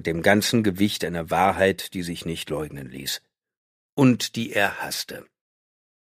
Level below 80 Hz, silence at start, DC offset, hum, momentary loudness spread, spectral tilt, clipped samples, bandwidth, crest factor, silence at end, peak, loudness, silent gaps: -54 dBFS; 0 s; under 0.1%; none; 13 LU; -4.5 dB/octave; under 0.1%; 15.5 kHz; 22 dB; 0.95 s; -2 dBFS; -23 LUFS; 3.57-3.97 s